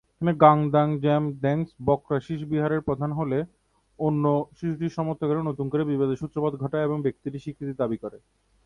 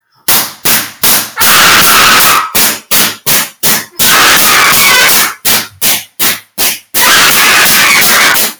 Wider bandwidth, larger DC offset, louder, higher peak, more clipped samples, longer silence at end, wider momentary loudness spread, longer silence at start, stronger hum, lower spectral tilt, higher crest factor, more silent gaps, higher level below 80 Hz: second, 6.8 kHz vs over 20 kHz; second, under 0.1% vs 0.9%; second, -25 LUFS vs -5 LUFS; about the same, -2 dBFS vs 0 dBFS; second, under 0.1% vs 2%; first, 0.5 s vs 0.05 s; about the same, 9 LU vs 7 LU; about the same, 0.2 s vs 0.3 s; neither; first, -9.5 dB/octave vs 0 dB/octave; first, 22 dB vs 8 dB; neither; second, -56 dBFS vs -46 dBFS